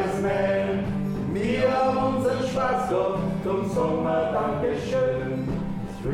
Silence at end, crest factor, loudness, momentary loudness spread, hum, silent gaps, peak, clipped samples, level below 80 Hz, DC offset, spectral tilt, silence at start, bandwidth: 0 s; 14 dB; -25 LUFS; 5 LU; none; none; -12 dBFS; under 0.1%; -44 dBFS; under 0.1%; -7 dB/octave; 0 s; 13.5 kHz